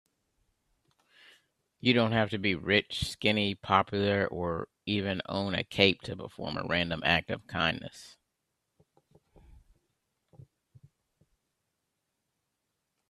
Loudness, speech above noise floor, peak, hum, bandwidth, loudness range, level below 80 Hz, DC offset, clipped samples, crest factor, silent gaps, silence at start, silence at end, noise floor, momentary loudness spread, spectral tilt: -29 LUFS; 53 dB; -4 dBFS; none; 13.5 kHz; 6 LU; -60 dBFS; under 0.1%; under 0.1%; 28 dB; none; 1.85 s; 5 s; -83 dBFS; 12 LU; -5.5 dB/octave